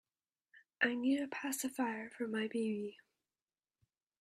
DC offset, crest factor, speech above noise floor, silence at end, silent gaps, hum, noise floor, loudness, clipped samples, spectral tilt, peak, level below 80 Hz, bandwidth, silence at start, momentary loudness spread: under 0.1%; 22 dB; over 52 dB; 1.25 s; none; none; under -90 dBFS; -38 LUFS; under 0.1%; -3.5 dB/octave; -18 dBFS; -86 dBFS; 15.5 kHz; 0.55 s; 8 LU